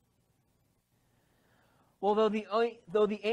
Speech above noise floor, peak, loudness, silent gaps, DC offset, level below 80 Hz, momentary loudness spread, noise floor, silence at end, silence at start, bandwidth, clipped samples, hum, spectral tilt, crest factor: 44 dB; -16 dBFS; -30 LUFS; none; under 0.1%; -74 dBFS; 3 LU; -74 dBFS; 0 s; 2 s; 8.6 kHz; under 0.1%; none; -6.5 dB/octave; 16 dB